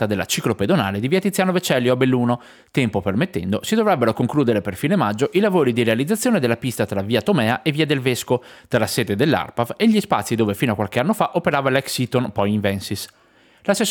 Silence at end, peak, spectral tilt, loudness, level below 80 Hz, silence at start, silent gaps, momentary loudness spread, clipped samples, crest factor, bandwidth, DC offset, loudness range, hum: 0 s; -4 dBFS; -5.5 dB/octave; -20 LUFS; -58 dBFS; 0 s; none; 5 LU; under 0.1%; 16 dB; 19.5 kHz; under 0.1%; 1 LU; none